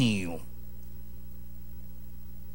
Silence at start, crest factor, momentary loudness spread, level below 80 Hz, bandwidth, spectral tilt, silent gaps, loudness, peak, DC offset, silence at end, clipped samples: 0 s; 20 dB; 15 LU; -48 dBFS; 16 kHz; -5.5 dB/octave; none; -39 LUFS; -14 dBFS; 2%; 0 s; under 0.1%